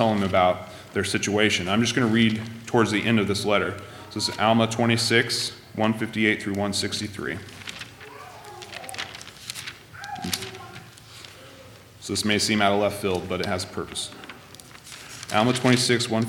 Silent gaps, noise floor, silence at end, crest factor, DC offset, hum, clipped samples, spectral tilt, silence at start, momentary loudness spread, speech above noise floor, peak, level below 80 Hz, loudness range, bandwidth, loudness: none; -47 dBFS; 0 s; 22 dB; under 0.1%; none; under 0.1%; -4 dB/octave; 0 s; 21 LU; 24 dB; -4 dBFS; -60 dBFS; 12 LU; 18 kHz; -23 LUFS